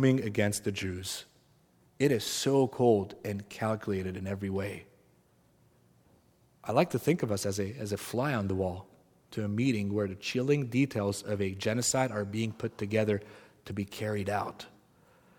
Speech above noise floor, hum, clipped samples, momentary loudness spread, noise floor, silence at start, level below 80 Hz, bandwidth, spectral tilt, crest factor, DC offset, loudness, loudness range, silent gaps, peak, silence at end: 35 dB; none; under 0.1%; 11 LU; -66 dBFS; 0 s; -66 dBFS; 18 kHz; -5.5 dB/octave; 22 dB; under 0.1%; -31 LUFS; 5 LU; none; -8 dBFS; 0.7 s